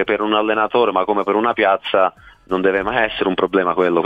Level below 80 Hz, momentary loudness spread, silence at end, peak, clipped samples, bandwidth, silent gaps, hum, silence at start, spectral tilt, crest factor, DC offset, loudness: -50 dBFS; 3 LU; 0 s; -2 dBFS; under 0.1%; 5 kHz; none; none; 0 s; -7 dB/octave; 16 dB; under 0.1%; -17 LUFS